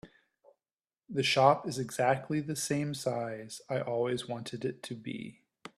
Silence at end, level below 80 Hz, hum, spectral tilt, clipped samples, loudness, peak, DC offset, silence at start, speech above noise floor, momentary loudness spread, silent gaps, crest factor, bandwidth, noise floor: 0.1 s; -72 dBFS; none; -4.5 dB/octave; under 0.1%; -32 LUFS; -8 dBFS; under 0.1%; 0.05 s; over 58 dB; 16 LU; 0.72-0.76 s; 24 dB; 14.5 kHz; under -90 dBFS